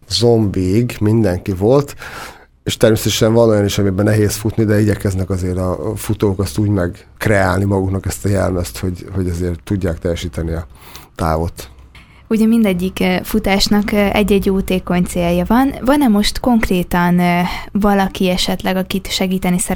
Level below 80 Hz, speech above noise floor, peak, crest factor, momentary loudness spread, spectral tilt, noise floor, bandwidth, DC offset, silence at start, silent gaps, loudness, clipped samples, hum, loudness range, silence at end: -32 dBFS; 26 dB; 0 dBFS; 16 dB; 9 LU; -5.5 dB/octave; -41 dBFS; 20 kHz; under 0.1%; 0.1 s; none; -16 LUFS; under 0.1%; none; 6 LU; 0 s